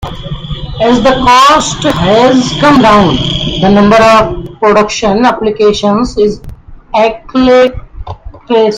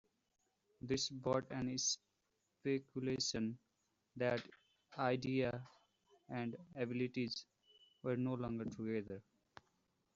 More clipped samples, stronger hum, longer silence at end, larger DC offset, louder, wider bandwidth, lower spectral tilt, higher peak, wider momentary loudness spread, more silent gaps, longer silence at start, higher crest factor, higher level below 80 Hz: first, 1% vs under 0.1%; neither; second, 0 s vs 0.95 s; neither; first, -8 LUFS vs -41 LUFS; first, 14 kHz vs 7.6 kHz; about the same, -5 dB/octave vs -4.5 dB/octave; first, 0 dBFS vs -22 dBFS; first, 16 LU vs 13 LU; neither; second, 0 s vs 0.85 s; second, 8 dB vs 20 dB; first, -28 dBFS vs -72 dBFS